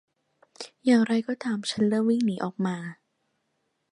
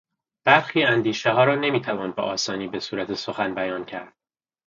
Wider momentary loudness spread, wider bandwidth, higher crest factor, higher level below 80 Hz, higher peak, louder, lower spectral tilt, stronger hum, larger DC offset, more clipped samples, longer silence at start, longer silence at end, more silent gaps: first, 16 LU vs 11 LU; first, 11 kHz vs 7.6 kHz; about the same, 18 dB vs 22 dB; second, -74 dBFS vs -64 dBFS; second, -8 dBFS vs 0 dBFS; second, -26 LUFS vs -22 LUFS; first, -6 dB/octave vs -4.5 dB/octave; neither; neither; neither; first, 0.6 s vs 0.45 s; first, 1 s vs 0.6 s; neither